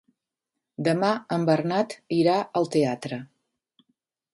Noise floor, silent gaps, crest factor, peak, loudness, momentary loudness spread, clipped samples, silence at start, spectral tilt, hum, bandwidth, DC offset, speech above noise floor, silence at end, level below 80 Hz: -85 dBFS; none; 18 dB; -8 dBFS; -25 LUFS; 11 LU; under 0.1%; 0.8 s; -6.5 dB/octave; none; 11.5 kHz; under 0.1%; 61 dB; 1.1 s; -70 dBFS